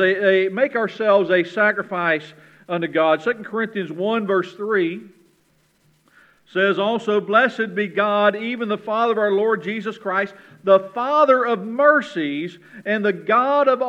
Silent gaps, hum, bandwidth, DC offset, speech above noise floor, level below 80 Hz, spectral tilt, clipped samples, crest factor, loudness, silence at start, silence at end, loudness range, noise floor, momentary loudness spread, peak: none; none; 8.2 kHz; under 0.1%; 42 dB; -76 dBFS; -6.5 dB/octave; under 0.1%; 18 dB; -20 LUFS; 0 s; 0 s; 5 LU; -61 dBFS; 10 LU; -2 dBFS